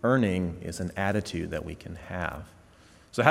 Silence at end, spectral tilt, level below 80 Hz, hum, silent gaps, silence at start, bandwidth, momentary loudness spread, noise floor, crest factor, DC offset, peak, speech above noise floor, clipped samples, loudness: 0 s; -6 dB/octave; -52 dBFS; none; none; 0.05 s; 16 kHz; 16 LU; -56 dBFS; 26 dB; under 0.1%; -2 dBFS; 26 dB; under 0.1%; -30 LUFS